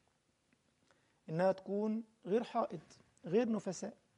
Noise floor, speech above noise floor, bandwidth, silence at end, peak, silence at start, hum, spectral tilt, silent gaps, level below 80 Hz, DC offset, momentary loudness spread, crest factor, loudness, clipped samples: -77 dBFS; 41 dB; 11 kHz; 0.25 s; -20 dBFS; 1.3 s; none; -6.5 dB/octave; none; -84 dBFS; under 0.1%; 10 LU; 18 dB; -38 LUFS; under 0.1%